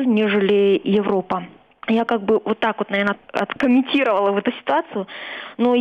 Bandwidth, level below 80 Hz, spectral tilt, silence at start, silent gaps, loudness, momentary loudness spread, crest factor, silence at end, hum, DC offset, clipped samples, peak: 7.2 kHz; -62 dBFS; -7.5 dB/octave; 0 s; none; -19 LUFS; 12 LU; 14 dB; 0 s; none; under 0.1%; under 0.1%; -6 dBFS